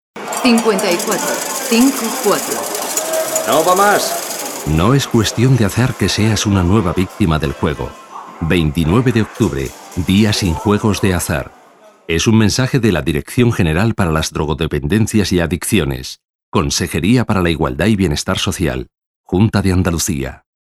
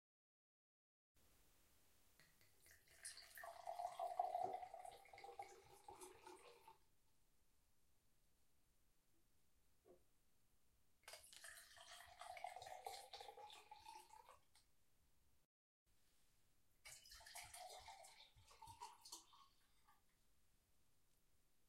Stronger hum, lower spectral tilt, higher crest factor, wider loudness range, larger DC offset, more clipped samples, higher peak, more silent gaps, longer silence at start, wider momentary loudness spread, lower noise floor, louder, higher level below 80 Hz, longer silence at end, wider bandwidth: neither; first, -5 dB/octave vs -1.5 dB/octave; second, 14 dB vs 30 dB; second, 2 LU vs 14 LU; neither; neither; first, 0 dBFS vs -30 dBFS; about the same, 16.30-16.52 s, 19.06-19.24 s vs 15.45-15.86 s; second, 0.15 s vs 1.15 s; second, 8 LU vs 16 LU; second, -45 dBFS vs -82 dBFS; first, -15 LUFS vs -56 LUFS; first, -32 dBFS vs -84 dBFS; about the same, 0.25 s vs 0.25 s; first, 19 kHz vs 16 kHz